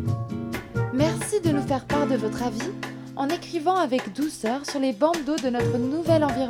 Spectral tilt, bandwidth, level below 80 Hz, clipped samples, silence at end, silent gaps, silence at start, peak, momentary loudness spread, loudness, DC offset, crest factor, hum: -6 dB/octave; 17 kHz; -50 dBFS; under 0.1%; 0 s; none; 0 s; -8 dBFS; 8 LU; -25 LUFS; under 0.1%; 16 dB; none